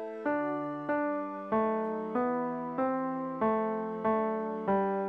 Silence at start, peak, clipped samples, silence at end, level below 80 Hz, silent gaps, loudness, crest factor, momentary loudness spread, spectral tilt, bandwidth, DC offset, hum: 0 s; -18 dBFS; under 0.1%; 0 s; -68 dBFS; none; -32 LUFS; 12 dB; 4 LU; -9.5 dB/octave; 5 kHz; under 0.1%; none